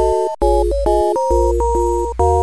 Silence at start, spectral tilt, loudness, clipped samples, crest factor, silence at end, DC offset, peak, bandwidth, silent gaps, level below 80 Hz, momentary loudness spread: 0 s; -7.5 dB/octave; -16 LUFS; under 0.1%; 12 dB; 0 s; 1%; -2 dBFS; 11 kHz; none; -22 dBFS; 2 LU